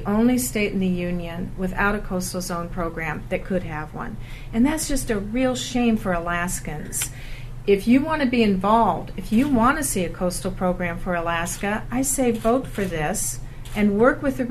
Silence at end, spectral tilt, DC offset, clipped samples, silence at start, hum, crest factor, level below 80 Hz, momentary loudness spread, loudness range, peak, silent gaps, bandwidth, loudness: 0 s; -5 dB/octave; under 0.1%; under 0.1%; 0 s; none; 20 dB; -34 dBFS; 11 LU; 5 LU; -4 dBFS; none; 13.5 kHz; -23 LUFS